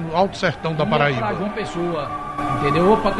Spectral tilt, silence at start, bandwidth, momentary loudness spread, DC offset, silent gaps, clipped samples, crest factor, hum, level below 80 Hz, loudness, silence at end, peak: -6.5 dB/octave; 0 s; 11.5 kHz; 9 LU; under 0.1%; none; under 0.1%; 16 dB; none; -40 dBFS; -21 LUFS; 0 s; -4 dBFS